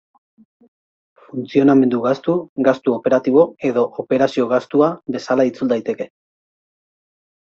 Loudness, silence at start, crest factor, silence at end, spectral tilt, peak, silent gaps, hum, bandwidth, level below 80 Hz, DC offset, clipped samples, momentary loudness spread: -17 LUFS; 1.35 s; 16 dB; 1.4 s; -7.5 dB/octave; -2 dBFS; 2.49-2.56 s; none; 7.4 kHz; -64 dBFS; under 0.1%; under 0.1%; 12 LU